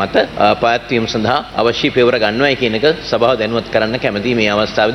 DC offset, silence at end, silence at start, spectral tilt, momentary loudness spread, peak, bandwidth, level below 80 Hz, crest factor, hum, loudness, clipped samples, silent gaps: under 0.1%; 0 s; 0 s; -5 dB/octave; 4 LU; -2 dBFS; 11.5 kHz; -42 dBFS; 14 dB; none; -14 LUFS; under 0.1%; none